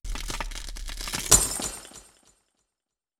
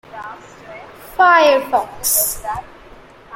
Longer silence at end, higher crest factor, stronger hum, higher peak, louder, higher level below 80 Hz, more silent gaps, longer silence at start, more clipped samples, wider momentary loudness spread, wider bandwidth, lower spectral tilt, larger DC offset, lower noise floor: first, 1.2 s vs 0 s; first, 28 dB vs 16 dB; neither; about the same, 0 dBFS vs -2 dBFS; second, -24 LUFS vs -14 LUFS; first, -38 dBFS vs -46 dBFS; neither; about the same, 0.05 s vs 0.15 s; neither; second, 20 LU vs 25 LU; first, over 20 kHz vs 16.5 kHz; about the same, -1 dB/octave vs -1 dB/octave; neither; first, -88 dBFS vs -41 dBFS